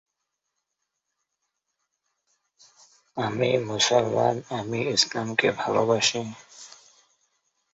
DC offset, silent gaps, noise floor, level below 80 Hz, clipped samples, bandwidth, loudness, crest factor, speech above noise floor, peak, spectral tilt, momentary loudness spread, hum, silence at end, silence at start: under 0.1%; none; -81 dBFS; -66 dBFS; under 0.1%; 8.4 kHz; -24 LUFS; 22 dB; 57 dB; -6 dBFS; -3 dB/octave; 18 LU; none; 1.05 s; 3.15 s